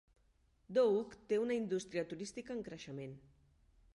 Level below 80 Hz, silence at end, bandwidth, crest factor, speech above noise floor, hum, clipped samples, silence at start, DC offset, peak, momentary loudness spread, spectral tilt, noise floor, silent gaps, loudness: -72 dBFS; 0.75 s; 11.5 kHz; 18 dB; 35 dB; none; under 0.1%; 0.7 s; under 0.1%; -22 dBFS; 15 LU; -5.5 dB/octave; -73 dBFS; none; -38 LUFS